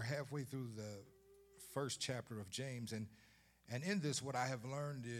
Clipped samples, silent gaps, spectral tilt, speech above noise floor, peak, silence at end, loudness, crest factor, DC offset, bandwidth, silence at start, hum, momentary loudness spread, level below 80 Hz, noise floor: under 0.1%; none; -4.5 dB/octave; 21 dB; -26 dBFS; 0 s; -45 LUFS; 18 dB; under 0.1%; 16.5 kHz; 0 s; none; 10 LU; -78 dBFS; -65 dBFS